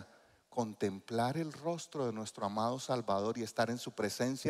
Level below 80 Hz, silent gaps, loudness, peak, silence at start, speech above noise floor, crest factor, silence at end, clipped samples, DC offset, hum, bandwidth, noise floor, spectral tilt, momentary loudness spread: -78 dBFS; none; -37 LUFS; -18 dBFS; 0 s; 27 dB; 18 dB; 0 s; under 0.1%; under 0.1%; none; 15.5 kHz; -63 dBFS; -5 dB/octave; 5 LU